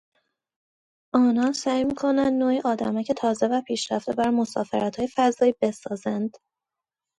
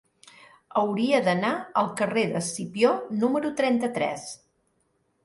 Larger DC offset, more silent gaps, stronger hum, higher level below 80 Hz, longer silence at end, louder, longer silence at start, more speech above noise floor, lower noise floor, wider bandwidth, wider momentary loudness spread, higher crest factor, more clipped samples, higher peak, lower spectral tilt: neither; neither; neither; first, -62 dBFS vs -70 dBFS; about the same, 0.9 s vs 0.9 s; about the same, -24 LUFS vs -25 LUFS; first, 1.15 s vs 0.75 s; first, 65 dB vs 46 dB; first, -88 dBFS vs -71 dBFS; about the same, 11.5 kHz vs 11.5 kHz; about the same, 7 LU vs 7 LU; about the same, 18 dB vs 18 dB; neither; about the same, -6 dBFS vs -8 dBFS; about the same, -5 dB/octave vs -5 dB/octave